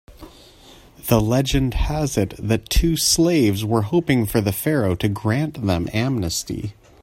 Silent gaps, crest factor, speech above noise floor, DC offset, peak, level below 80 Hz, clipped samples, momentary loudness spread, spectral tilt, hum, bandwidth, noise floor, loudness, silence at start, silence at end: none; 18 dB; 27 dB; under 0.1%; -2 dBFS; -32 dBFS; under 0.1%; 7 LU; -5 dB/octave; none; 16.5 kHz; -47 dBFS; -20 LUFS; 0.1 s; 0.3 s